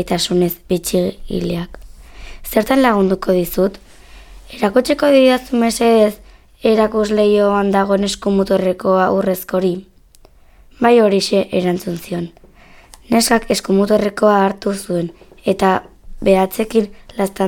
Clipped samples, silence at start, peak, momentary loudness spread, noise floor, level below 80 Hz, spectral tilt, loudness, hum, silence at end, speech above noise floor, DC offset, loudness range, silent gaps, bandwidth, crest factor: under 0.1%; 0 s; 0 dBFS; 10 LU; -46 dBFS; -40 dBFS; -5 dB/octave; -16 LUFS; none; 0 s; 32 dB; under 0.1%; 4 LU; none; 19 kHz; 16 dB